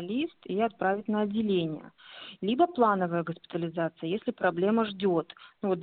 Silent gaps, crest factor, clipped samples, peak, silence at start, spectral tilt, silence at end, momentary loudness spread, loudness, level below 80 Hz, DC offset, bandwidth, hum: none; 18 dB; under 0.1%; -12 dBFS; 0 s; -5 dB/octave; 0 s; 10 LU; -29 LUFS; -70 dBFS; under 0.1%; 4.6 kHz; none